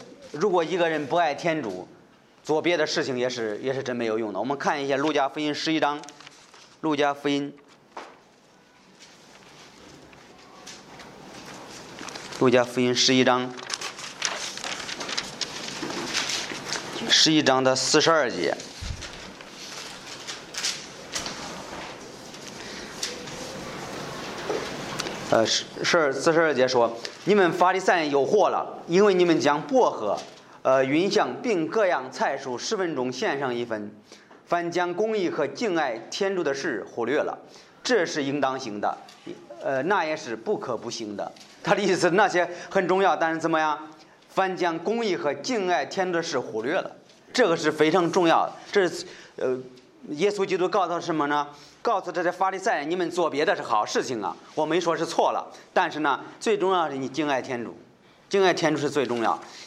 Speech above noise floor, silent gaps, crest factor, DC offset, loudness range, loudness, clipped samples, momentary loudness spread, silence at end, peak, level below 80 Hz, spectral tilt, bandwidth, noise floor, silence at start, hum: 32 dB; none; 22 dB; under 0.1%; 10 LU; -25 LUFS; under 0.1%; 16 LU; 0 s; -4 dBFS; -60 dBFS; -3.5 dB/octave; 14 kHz; -56 dBFS; 0 s; none